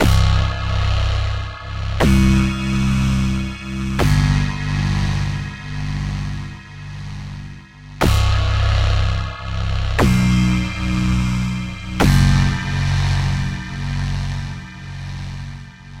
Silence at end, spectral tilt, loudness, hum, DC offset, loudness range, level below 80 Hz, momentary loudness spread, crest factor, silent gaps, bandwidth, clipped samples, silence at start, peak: 0 s; -6 dB/octave; -19 LUFS; none; under 0.1%; 6 LU; -24 dBFS; 16 LU; 18 dB; none; 16 kHz; under 0.1%; 0 s; 0 dBFS